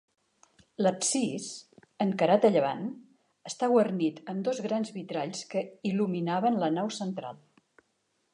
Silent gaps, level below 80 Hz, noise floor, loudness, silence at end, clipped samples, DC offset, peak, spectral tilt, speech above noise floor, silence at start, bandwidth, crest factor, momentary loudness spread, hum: none; -80 dBFS; -75 dBFS; -29 LUFS; 1 s; under 0.1%; under 0.1%; -10 dBFS; -5 dB/octave; 47 dB; 0.8 s; 11 kHz; 20 dB; 15 LU; none